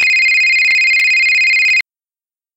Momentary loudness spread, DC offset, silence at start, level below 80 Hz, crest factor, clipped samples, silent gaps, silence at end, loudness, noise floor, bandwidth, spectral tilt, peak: 3 LU; under 0.1%; 0 s; -68 dBFS; 10 dB; under 0.1%; none; 0.75 s; -9 LUFS; under -90 dBFS; 17 kHz; 4 dB/octave; -4 dBFS